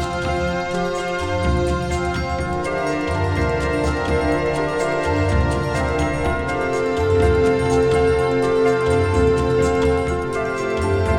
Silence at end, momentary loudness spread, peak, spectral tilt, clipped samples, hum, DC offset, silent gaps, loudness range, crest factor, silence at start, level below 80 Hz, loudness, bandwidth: 0 s; 5 LU; -4 dBFS; -6.5 dB/octave; under 0.1%; none; under 0.1%; none; 4 LU; 14 dB; 0 s; -30 dBFS; -20 LUFS; 12 kHz